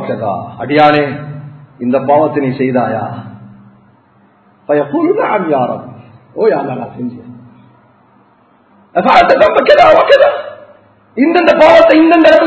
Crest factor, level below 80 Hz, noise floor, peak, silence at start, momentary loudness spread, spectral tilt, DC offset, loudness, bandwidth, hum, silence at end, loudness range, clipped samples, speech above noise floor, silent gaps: 12 dB; -48 dBFS; -49 dBFS; 0 dBFS; 0 s; 18 LU; -6.5 dB/octave; under 0.1%; -10 LUFS; 8 kHz; none; 0 s; 9 LU; 0.8%; 40 dB; none